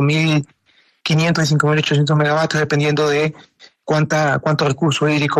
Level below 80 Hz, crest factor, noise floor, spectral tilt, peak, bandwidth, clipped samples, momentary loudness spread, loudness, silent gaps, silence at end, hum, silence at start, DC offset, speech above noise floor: -54 dBFS; 16 dB; -57 dBFS; -5.5 dB/octave; -2 dBFS; 12 kHz; under 0.1%; 6 LU; -17 LUFS; none; 0 s; none; 0 s; under 0.1%; 41 dB